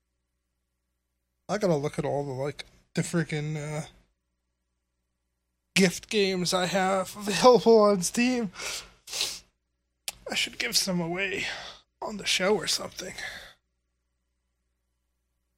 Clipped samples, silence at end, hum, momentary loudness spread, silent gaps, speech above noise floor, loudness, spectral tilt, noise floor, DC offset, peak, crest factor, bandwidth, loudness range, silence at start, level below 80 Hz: under 0.1%; 2.1 s; 60 Hz at -55 dBFS; 18 LU; none; 53 dB; -26 LUFS; -4 dB/octave; -79 dBFS; under 0.1%; -4 dBFS; 24 dB; 16 kHz; 9 LU; 1.5 s; -62 dBFS